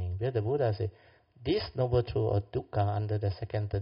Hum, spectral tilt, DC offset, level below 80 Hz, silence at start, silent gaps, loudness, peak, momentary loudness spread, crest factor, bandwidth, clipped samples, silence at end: none; -7 dB/octave; under 0.1%; -50 dBFS; 0 s; none; -31 LUFS; -16 dBFS; 6 LU; 16 dB; 5.4 kHz; under 0.1%; 0 s